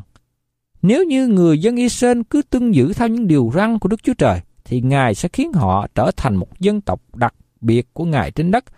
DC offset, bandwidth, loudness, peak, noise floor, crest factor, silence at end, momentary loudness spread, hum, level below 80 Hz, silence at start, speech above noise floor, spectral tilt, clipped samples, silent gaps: under 0.1%; 14 kHz; -17 LUFS; -2 dBFS; -72 dBFS; 14 dB; 0.15 s; 7 LU; none; -40 dBFS; 0.85 s; 56 dB; -7 dB/octave; under 0.1%; none